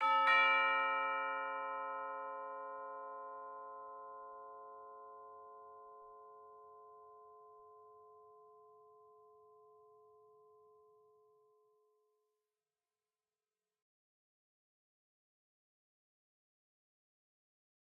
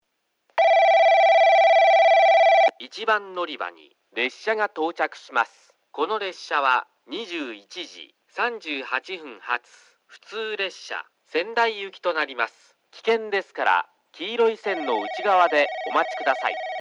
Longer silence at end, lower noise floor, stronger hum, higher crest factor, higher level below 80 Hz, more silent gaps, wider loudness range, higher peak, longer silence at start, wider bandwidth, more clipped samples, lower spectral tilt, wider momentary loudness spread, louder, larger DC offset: first, 9.3 s vs 0 s; first, under -90 dBFS vs -70 dBFS; neither; first, 24 dB vs 16 dB; about the same, under -90 dBFS vs -88 dBFS; neither; first, 26 LU vs 12 LU; second, -20 dBFS vs -6 dBFS; second, 0 s vs 0.55 s; second, 5.8 kHz vs 7.8 kHz; neither; second, 4 dB/octave vs -2 dB/octave; first, 29 LU vs 18 LU; second, -36 LUFS vs -22 LUFS; neither